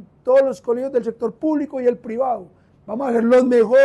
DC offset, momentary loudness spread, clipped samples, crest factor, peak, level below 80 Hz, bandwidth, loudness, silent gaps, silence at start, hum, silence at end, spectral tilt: under 0.1%; 11 LU; under 0.1%; 12 dB; -6 dBFS; -62 dBFS; 10.5 kHz; -19 LUFS; none; 0 s; none; 0 s; -6.5 dB/octave